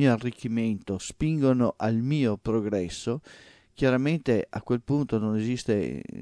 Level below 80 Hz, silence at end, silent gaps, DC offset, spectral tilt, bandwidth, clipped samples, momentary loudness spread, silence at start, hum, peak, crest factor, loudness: -52 dBFS; 0 s; none; under 0.1%; -7 dB/octave; 10.5 kHz; under 0.1%; 8 LU; 0 s; none; -8 dBFS; 18 dB; -27 LUFS